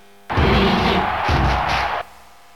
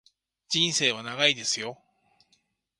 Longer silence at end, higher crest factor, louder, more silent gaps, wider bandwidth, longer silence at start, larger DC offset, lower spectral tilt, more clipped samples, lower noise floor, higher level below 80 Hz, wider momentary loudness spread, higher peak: second, 0.5 s vs 1.05 s; second, 16 dB vs 24 dB; first, -18 LUFS vs -25 LUFS; neither; first, 14.5 kHz vs 11.5 kHz; second, 0.3 s vs 0.5 s; first, 0.5% vs under 0.1%; first, -6 dB/octave vs -1.5 dB/octave; neither; second, -46 dBFS vs -71 dBFS; first, -28 dBFS vs -72 dBFS; about the same, 9 LU vs 8 LU; about the same, -4 dBFS vs -6 dBFS